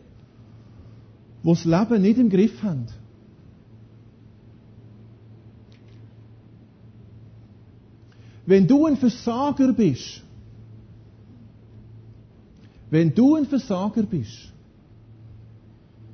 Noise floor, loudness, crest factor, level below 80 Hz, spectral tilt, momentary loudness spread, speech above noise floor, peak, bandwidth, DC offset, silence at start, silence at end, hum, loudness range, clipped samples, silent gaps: -50 dBFS; -20 LUFS; 18 dB; -54 dBFS; -8 dB/octave; 17 LU; 31 dB; -6 dBFS; 6.6 kHz; under 0.1%; 1.45 s; 1.75 s; none; 8 LU; under 0.1%; none